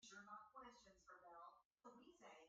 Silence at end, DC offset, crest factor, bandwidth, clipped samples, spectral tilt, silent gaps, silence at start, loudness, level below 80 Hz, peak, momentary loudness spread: 0 s; under 0.1%; 16 dB; 7.4 kHz; under 0.1%; -1.5 dB/octave; 1.65-1.76 s; 0 s; -64 LUFS; -90 dBFS; -48 dBFS; 8 LU